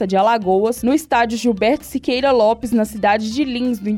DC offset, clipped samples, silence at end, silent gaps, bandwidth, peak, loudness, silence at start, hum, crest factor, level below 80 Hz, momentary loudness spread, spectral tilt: under 0.1%; under 0.1%; 0 s; none; 17 kHz; -6 dBFS; -17 LUFS; 0 s; none; 12 dB; -46 dBFS; 5 LU; -5 dB/octave